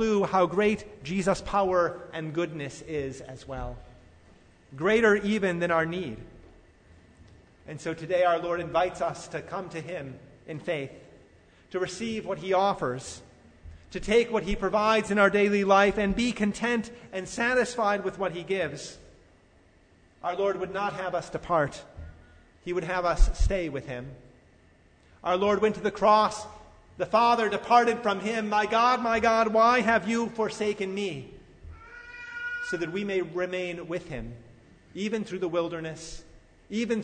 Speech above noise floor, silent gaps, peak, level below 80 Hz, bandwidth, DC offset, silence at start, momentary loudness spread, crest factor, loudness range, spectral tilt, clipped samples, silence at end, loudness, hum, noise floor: 33 dB; none; -8 dBFS; -40 dBFS; 9.6 kHz; under 0.1%; 0 s; 18 LU; 20 dB; 9 LU; -5 dB/octave; under 0.1%; 0 s; -27 LUFS; none; -59 dBFS